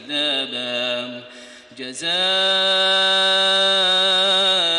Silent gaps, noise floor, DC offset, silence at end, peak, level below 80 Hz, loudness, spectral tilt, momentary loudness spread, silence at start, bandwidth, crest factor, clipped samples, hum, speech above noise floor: none; -42 dBFS; under 0.1%; 0 s; -8 dBFS; -68 dBFS; -16 LUFS; -1 dB/octave; 12 LU; 0 s; 11 kHz; 12 dB; under 0.1%; none; 23 dB